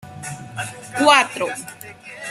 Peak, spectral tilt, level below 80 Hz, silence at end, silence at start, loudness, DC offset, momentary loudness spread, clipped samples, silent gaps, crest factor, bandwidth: 0 dBFS; -2.5 dB/octave; -62 dBFS; 0 s; 0.05 s; -18 LUFS; under 0.1%; 22 LU; under 0.1%; none; 22 dB; 15.5 kHz